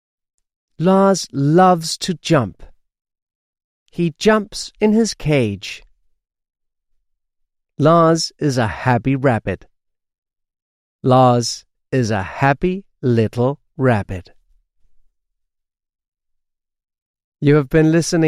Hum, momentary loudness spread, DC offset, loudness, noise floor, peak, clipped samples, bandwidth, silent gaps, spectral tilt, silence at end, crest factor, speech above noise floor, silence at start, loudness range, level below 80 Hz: none; 13 LU; under 0.1%; -17 LUFS; -78 dBFS; -2 dBFS; under 0.1%; 15 kHz; 3.22-3.27 s, 3.35-3.53 s, 3.64-3.86 s, 10.18-10.22 s, 10.62-10.99 s, 16.08-16.12 s, 17.02-17.14 s, 17.24-17.32 s; -6 dB/octave; 0 s; 16 dB; 63 dB; 0.8 s; 5 LU; -46 dBFS